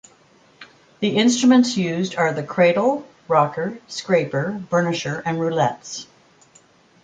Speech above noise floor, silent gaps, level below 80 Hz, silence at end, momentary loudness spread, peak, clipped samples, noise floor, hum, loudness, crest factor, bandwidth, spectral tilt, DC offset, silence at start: 35 dB; none; -64 dBFS; 1 s; 12 LU; -2 dBFS; under 0.1%; -54 dBFS; none; -20 LUFS; 18 dB; 9.2 kHz; -5 dB/octave; under 0.1%; 0.6 s